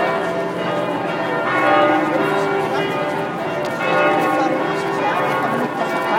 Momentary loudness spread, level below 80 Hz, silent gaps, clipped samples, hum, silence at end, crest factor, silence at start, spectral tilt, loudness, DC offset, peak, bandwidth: 6 LU; -62 dBFS; none; under 0.1%; none; 0 s; 16 dB; 0 s; -5.5 dB/octave; -19 LUFS; under 0.1%; -2 dBFS; 16 kHz